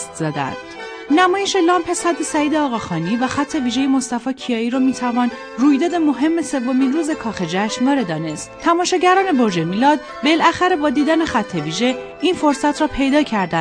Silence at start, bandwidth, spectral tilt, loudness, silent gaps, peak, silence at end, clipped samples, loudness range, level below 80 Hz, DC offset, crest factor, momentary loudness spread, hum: 0 s; 10.5 kHz; -4.5 dB/octave; -18 LUFS; none; -2 dBFS; 0 s; under 0.1%; 3 LU; -48 dBFS; under 0.1%; 16 dB; 8 LU; none